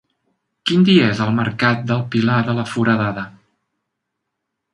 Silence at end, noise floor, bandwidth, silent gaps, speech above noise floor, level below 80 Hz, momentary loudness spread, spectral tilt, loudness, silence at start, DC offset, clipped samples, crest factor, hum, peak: 1.45 s; -77 dBFS; 11 kHz; none; 61 dB; -56 dBFS; 11 LU; -6.5 dB/octave; -17 LUFS; 0.65 s; under 0.1%; under 0.1%; 18 dB; none; 0 dBFS